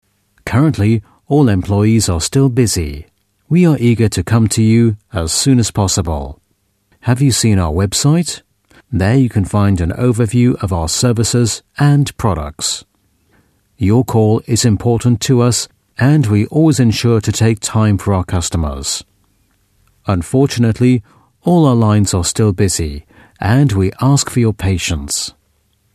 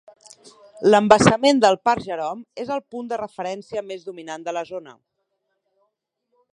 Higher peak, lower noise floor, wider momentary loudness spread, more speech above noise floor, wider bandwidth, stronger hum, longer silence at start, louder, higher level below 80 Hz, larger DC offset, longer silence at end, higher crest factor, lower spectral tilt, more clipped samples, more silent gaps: about the same, 0 dBFS vs 0 dBFS; second, -62 dBFS vs -74 dBFS; second, 8 LU vs 19 LU; second, 49 dB vs 54 dB; first, 14 kHz vs 11 kHz; neither; second, 0.45 s vs 0.75 s; first, -14 LUFS vs -20 LUFS; first, -34 dBFS vs -56 dBFS; neither; second, 0.65 s vs 1.65 s; second, 14 dB vs 22 dB; about the same, -5.5 dB/octave vs -5 dB/octave; neither; neither